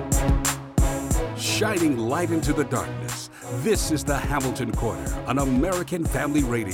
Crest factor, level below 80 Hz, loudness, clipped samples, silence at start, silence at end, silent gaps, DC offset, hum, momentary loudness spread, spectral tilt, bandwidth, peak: 14 dB; -30 dBFS; -24 LUFS; under 0.1%; 0 s; 0 s; none; under 0.1%; none; 6 LU; -5 dB/octave; 17.5 kHz; -10 dBFS